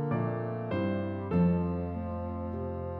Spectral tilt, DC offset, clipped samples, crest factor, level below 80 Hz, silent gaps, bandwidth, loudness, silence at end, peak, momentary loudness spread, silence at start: -11.5 dB/octave; under 0.1%; under 0.1%; 14 dB; -50 dBFS; none; 4.5 kHz; -32 LUFS; 0 s; -18 dBFS; 9 LU; 0 s